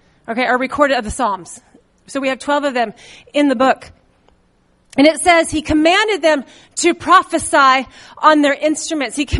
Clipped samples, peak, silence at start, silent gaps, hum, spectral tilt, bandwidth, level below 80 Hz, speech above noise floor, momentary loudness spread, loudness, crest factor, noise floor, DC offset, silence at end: under 0.1%; 0 dBFS; 0.3 s; none; none; -3.5 dB/octave; 11.5 kHz; -38 dBFS; 42 dB; 11 LU; -15 LUFS; 16 dB; -57 dBFS; under 0.1%; 0 s